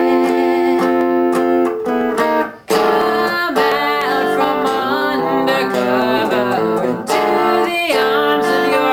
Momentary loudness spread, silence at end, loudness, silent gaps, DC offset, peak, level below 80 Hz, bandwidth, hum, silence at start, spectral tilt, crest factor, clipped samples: 3 LU; 0 s; -15 LUFS; none; under 0.1%; 0 dBFS; -54 dBFS; 16 kHz; none; 0 s; -4.5 dB/octave; 14 dB; under 0.1%